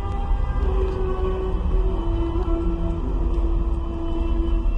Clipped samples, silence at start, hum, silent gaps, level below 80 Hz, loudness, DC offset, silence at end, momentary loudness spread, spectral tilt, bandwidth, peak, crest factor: under 0.1%; 0 s; none; none; -22 dBFS; -25 LUFS; under 0.1%; 0 s; 2 LU; -9.5 dB/octave; 4 kHz; -10 dBFS; 12 dB